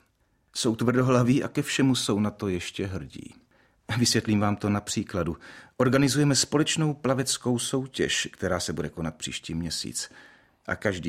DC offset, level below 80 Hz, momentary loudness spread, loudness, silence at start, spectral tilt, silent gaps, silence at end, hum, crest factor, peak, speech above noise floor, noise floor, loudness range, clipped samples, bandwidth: under 0.1%; -54 dBFS; 12 LU; -26 LUFS; 0.55 s; -4.5 dB/octave; none; 0 s; none; 20 dB; -8 dBFS; 42 dB; -68 dBFS; 4 LU; under 0.1%; 16 kHz